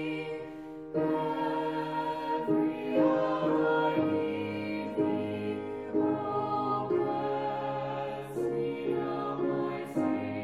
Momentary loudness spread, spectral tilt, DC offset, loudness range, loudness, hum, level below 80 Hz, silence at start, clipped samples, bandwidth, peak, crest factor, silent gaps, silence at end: 8 LU; -8 dB/octave; under 0.1%; 3 LU; -31 LUFS; none; -70 dBFS; 0 s; under 0.1%; 11.5 kHz; -14 dBFS; 16 dB; none; 0 s